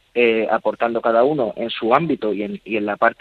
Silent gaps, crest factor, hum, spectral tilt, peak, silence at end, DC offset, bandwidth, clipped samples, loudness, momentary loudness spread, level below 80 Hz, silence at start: none; 18 dB; none; -7.5 dB/octave; 0 dBFS; 0.05 s; under 0.1%; 4.8 kHz; under 0.1%; -19 LUFS; 7 LU; -62 dBFS; 0.15 s